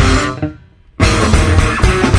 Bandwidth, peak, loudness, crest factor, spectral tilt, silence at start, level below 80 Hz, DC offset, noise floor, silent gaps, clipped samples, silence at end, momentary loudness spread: 10.5 kHz; 0 dBFS; -13 LUFS; 12 dB; -5 dB/octave; 0 s; -18 dBFS; under 0.1%; -38 dBFS; none; under 0.1%; 0 s; 10 LU